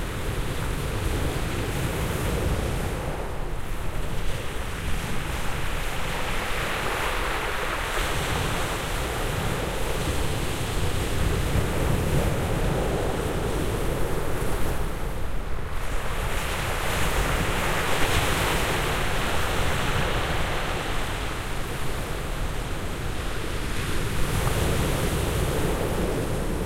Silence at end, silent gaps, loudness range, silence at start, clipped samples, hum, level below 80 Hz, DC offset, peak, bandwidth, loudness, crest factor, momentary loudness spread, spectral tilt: 0 s; none; 5 LU; 0 s; under 0.1%; none; -30 dBFS; under 0.1%; -8 dBFS; 16 kHz; -27 LUFS; 18 dB; 7 LU; -4.5 dB/octave